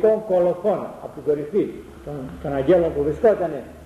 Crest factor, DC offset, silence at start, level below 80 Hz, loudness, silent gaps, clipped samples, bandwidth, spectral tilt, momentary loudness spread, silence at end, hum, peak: 14 dB; under 0.1%; 0 s; -46 dBFS; -21 LUFS; none; under 0.1%; 13 kHz; -8.5 dB/octave; 15 LU; 0 s; none; -6 dBFS